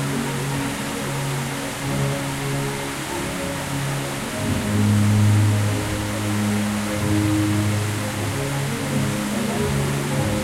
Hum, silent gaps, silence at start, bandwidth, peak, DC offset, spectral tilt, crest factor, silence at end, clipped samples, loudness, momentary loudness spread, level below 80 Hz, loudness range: none; none; 0 s; 16 kHz; -8 dBFS; under 0.1%; -5 dB/octave; 14 dB; 0 s; under 0.1%; -22 LUFS; 7 LU; -42 dBFS; 5 LU